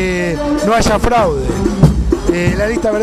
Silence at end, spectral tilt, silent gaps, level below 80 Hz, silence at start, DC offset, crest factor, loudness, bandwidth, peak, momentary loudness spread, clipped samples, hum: 0 s; -6 dB/octave; none; -22 dBFS; 0 s; under 0.1%; 12 dB; -14 LUFS; 13.5 kHz; 0 dBFS; 4 LU; under 0.1%; none